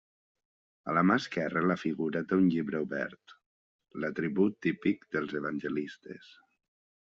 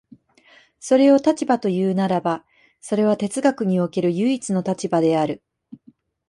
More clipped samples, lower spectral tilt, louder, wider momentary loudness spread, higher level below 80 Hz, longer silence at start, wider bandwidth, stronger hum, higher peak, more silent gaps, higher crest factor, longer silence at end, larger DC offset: neither; about the same, -5.5 dB/octave vs -6.5 dB/octave; second, -31 LUFS vs -20 LUFS; first, 15 LU vs 10 LU; second, -72 dBFS vs -66 dBFS; about the same, 0.85 s vs 0.85 s; second, 7.4 kHz vs 11.5 kHz; neither; second, -12 dBFS vs -4 dBFS; first, 3.46-3.79 s vs none; about the same, 20 dB vs 16 dB; first, 1 s vs 0.55 s; neither